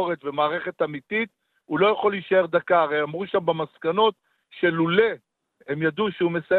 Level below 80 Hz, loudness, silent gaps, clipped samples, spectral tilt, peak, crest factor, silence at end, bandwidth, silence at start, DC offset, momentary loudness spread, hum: -66 dBFS; -23 LUFS; none; under 0.1%; -8.5 dB/octave; -6 dBFS; 18 dB; 0 s; 4.4 kHz; 0 s; under 0.1%; 7 LU; none